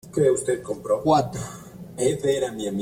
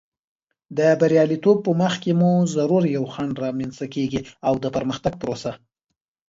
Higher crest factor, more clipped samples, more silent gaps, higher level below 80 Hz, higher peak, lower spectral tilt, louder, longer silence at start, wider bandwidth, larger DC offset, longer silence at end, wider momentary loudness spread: about the same, 18 dB vs 16 dB; neither; neither; about the same, -54 dBFS vs -56 dBFS; about the same, -6 dBFS vs -4 dBFS; second, -5.5 dB/octave vs -7 dB/octave; about the same, -23 LUFS vs -21 LUFS; second, 0.05 s vs 0.7 s; first, 16.5 kHz vs 7.8 kHz; neither; second, 0 s vs 0.75 s; first, 15 LU vs 10 LU